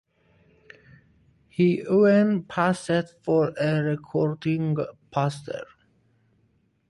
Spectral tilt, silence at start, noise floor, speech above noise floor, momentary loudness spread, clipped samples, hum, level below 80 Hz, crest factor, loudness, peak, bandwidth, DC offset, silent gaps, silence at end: -7.5 dB/octave; 1.6 s; -67 dBFS; 43 dB; 14 LU; under 0.1%; none; -64 dBFS; 18 dB; -24 LUFS; -8 dBFS; 11.5 kHz; under 0.1%; none; 1.25 s